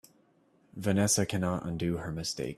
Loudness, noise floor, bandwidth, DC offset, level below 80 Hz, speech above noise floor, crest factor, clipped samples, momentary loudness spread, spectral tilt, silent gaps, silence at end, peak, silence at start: -30 LUFS; -66 dBFS; 14 kHz; under 0.1%; -58 dBFS; 36 dB; 18 dB; under 0.1%; 9 LU; -4.5 dB/octave; none; 0 s; -14 dBFS; 0.75 s